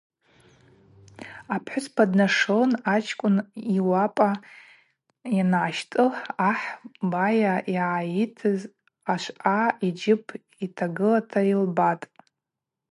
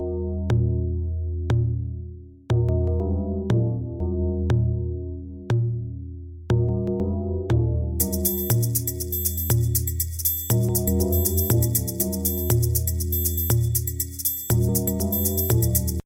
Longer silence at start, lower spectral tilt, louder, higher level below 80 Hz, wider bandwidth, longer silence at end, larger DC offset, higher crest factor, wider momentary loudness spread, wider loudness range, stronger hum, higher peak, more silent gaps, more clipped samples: first, 1.2 s vs 0 s; about the same, -6.5 dB/octave vs -6 dB/octave; about the same, -24 LUFS vs -23 LUFS; second, -74 dBFS vs -32 dBFS; second, 11.5 kHz vs 17 kHz; first, 0.85 s vs 0.05 s; neither; about the same, 20 dB vs 18 dB; first, 13 LU vs 7 LU; about the same, 3 LU vs 4 LU; neither; about the same, -4 dBFS vs -6 dBFS; neither; neither